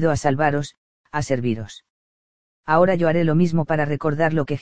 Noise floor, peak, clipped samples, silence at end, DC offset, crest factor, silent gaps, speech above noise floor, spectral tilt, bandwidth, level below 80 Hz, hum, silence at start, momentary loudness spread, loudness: under -90 dBFS; -2 dBFS; under 0.1%; 0 s; 2%; 18 dB; 0.77-1.04 s, 1.90-2.63 s; over 70 dB; -7 dB/octave; 9.4 kHz; -48 dBFS; none; 0 s; 12 LU; -21 LUFS